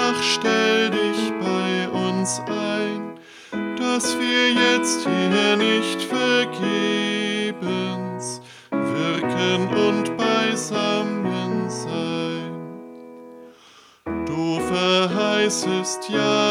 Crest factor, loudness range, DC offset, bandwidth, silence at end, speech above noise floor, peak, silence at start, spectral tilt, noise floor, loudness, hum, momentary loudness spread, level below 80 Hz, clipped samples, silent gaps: 18 dB; 7 LU; under 0.1%; 16 kHz; 0 s; 30 dB; -4 dBFS; 0 s; -3.5 dB/octave; -51 dBFS; -21 LUFS; none; 13 LU; -60 dBFS; under 0.1%; none